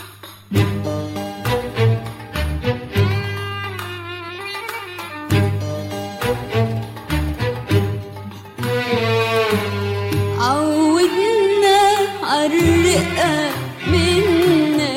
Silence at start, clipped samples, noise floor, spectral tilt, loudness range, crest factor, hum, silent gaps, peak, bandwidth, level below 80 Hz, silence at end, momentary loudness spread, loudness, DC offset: 0 s; under 0.1%; -39 dBFS; -5.5 dB/octave; 7 LU; 14 dB; none; none; -4 dBFS; 16 kHz; -36 dBFS; 0 s; 13 LU; -19 LUFS; under 0.1%